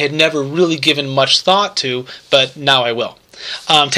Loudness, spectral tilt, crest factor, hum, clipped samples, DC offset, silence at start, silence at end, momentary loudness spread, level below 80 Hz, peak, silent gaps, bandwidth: -14 LUFS; -3 dB/octave; 16 dB; none; under 0.1%; under 0.1%; 0 s; 0 s; 12 LU; -60 dBFS; 0 dBFS; none; 15 kHz